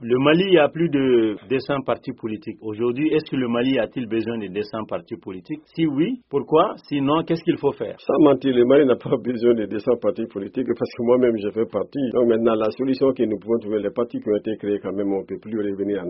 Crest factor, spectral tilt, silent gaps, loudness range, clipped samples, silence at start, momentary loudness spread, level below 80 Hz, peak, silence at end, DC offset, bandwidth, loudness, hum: 18 dB; -5.5 dB/octave; none; 5 LU; under 0.1%; 0 s; 11 LU; -58 dBFS; -2 dBFS; 0 s; under 0.1%; 5.8 kHz; -21 LUFS; none